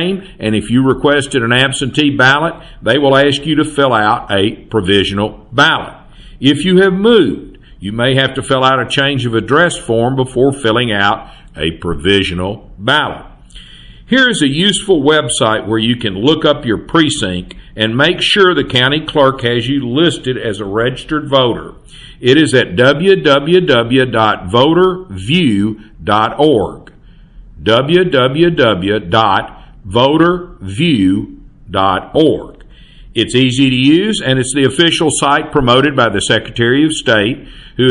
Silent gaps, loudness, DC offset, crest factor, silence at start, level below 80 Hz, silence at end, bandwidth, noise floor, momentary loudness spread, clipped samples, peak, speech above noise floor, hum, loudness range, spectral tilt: none; -12 LUFS; under 0.1%; 12 dB; 0 s; -36 dBFS; 0 s; 11.5 kHz; -39 dBFS; 10 LU; under 0.1%; 0 dBFS; 27 dB; none; 3 LU; -5 dB/octave